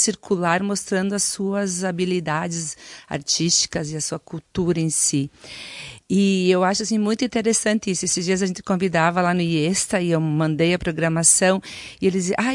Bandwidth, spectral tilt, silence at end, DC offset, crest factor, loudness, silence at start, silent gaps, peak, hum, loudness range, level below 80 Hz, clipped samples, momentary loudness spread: 11.5 kHz; -4 dB/octave; 0 s; under 0.1%; 18 dB; -20 LUFS; 0 s; none; -2 dBFS; none; 4 LU; -54 dBFS; under 0.1%; 11 LU